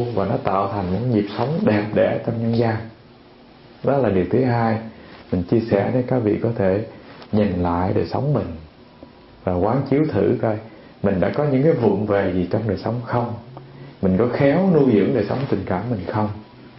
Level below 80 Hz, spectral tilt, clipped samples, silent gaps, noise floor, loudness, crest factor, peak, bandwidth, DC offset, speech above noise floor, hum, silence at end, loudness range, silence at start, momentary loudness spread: -48 dBFS; -12.5 dB/octave; under 0.1%; none; -46 dBFS; -20 LUFS; 18 dB; -2 dBFS; 5.8 kHz; under 0.1%; 27 dB; none; 0 s; 3 LU; 0 s; 10 LU